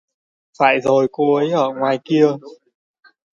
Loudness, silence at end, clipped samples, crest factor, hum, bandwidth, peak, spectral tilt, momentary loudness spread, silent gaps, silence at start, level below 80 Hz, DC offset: -17 LUFS; 0.8 s; under 0.1%; 18 dB; none; 7.4 kHz; 0 dBFS; -6.5 dB/octave; 3 LU; none; 0.6 s; -66 dBFS; under 0.1%